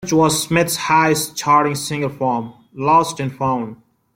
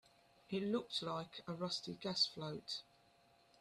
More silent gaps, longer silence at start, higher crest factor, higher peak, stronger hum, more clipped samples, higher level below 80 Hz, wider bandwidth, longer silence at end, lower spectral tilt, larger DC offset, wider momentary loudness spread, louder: neither; second, 0 s vs 0.5 s; second, 16 dB vs 22 dB; first, -2 dBFS vs -22 dBFS; neither; neither; first, -56 dBFS vs -80 dBFS; first, 16.5 kHz vs 13.5 kHz; second, 0.4 s vs 0.8 s; about the same, -4 dB/octave vs -4.5 dB/octave; neither; about the same, 9 LU vs 10 LU; first, -17 LUFS vs -42 LUFS